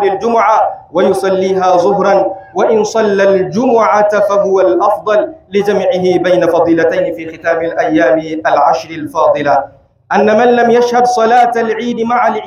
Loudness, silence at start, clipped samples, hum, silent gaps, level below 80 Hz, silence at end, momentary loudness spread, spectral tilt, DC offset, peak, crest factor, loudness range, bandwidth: -11 LUFS; 0 s; under 0.1%; none; none; -54 dBFS; 0 s; 6 LU; -5.5 dB/octave; under 0.1%; 0 dBFS; 10 dB; 2 LU; 14 kHz